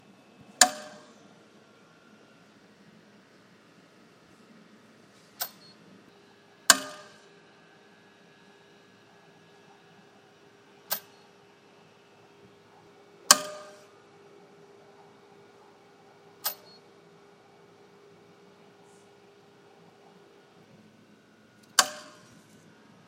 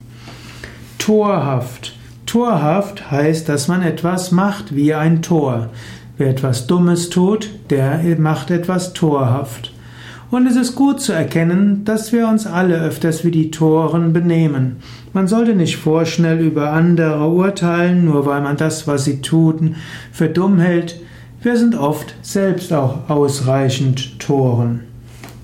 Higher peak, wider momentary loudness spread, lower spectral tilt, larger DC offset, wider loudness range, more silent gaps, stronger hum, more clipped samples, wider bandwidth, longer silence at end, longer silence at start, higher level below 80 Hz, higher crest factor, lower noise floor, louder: first, 0 dBFS vs -4 dBFS; first, 31 LU vs 14 LU; second, 1 dB/octave vs -6.5 dB/octave; neither; first, 16 LU vs 2 LU; neither; neither; neither; about the same, 16 kHz vs 16 kHz; first, 1.05 s vs 0 s; first, 0.6 s vs 0.05 s; second, -88 dBFS vs -50 dBFS; first, 36 dB vs 12 dB; first, -58 dBFS vs -35 dBFS; second, -25 LUFS vs -16 LUFS